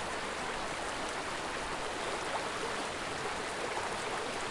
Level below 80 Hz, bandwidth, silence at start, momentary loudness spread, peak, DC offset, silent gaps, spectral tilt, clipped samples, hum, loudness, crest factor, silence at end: -56 dBFS; 11.5 kHz; 0 s; 1 LU; -22 dBFS; under 0.1%; none; -2.5 dB/octave; under 0.1%; none; -36 LUFS; 16 dB; 0 s